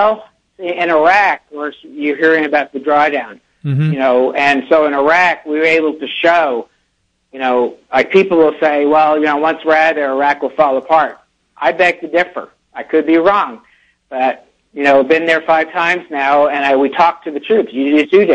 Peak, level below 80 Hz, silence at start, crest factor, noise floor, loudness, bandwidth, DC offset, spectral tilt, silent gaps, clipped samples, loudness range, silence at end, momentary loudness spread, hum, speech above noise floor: 0 dBFS; -58 dBFS; 0 s; 14 dB; -64 dBFS; -13 LUFS; 8.8 kHz; under 0.1%; -6.5 dB/octave; none; under 0.1%; 3 LU; 0 s; 11 LU; none; 51 dB